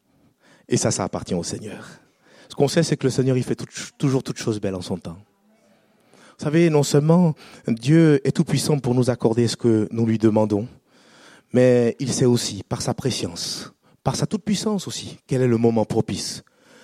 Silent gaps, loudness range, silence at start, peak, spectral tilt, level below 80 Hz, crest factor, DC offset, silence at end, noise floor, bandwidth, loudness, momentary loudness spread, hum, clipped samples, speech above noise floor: none; 6 LU; 0.7 s; -2 dBFS; -6 dB/octave; -56 dBFS; 18 dB; under 0.1%; 0.45 s; -59 dBFS; 15 kHz; -21 LUFS; 14 LU; none; under 0.1%; 38 dB